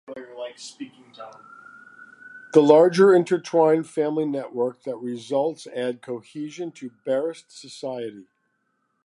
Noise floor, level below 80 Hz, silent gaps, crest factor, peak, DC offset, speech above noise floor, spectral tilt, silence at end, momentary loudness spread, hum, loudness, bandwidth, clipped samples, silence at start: -72 dBFS; -80 dBFS; none; 22 dB; -2 dBFS; under 0.1%; 50 dB; -6 dB/octave; 0.85 s; 25 LU; none; -22 LUFS; 11.5 kHz; under 0.1%; 0.1 s